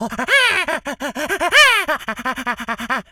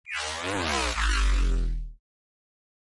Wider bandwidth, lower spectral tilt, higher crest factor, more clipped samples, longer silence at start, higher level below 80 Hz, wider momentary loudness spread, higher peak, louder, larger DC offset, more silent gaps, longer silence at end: first, over 20 kHz vs 11.5 kHz; second, -1 dB/octave vs -3.5 dB/octave; about the same, 18 dB vs 14 dB; neither; about the same, 0 s vs 0.05 s; second, -50 dBFS vs -30 dBFS; first, 13 LU vs 10 LU; first, -2 dBFS vs -14 dBFS; first, -16 LUFS vs -28 LUFS; neither; neither; second, 0.1 s vs 1 s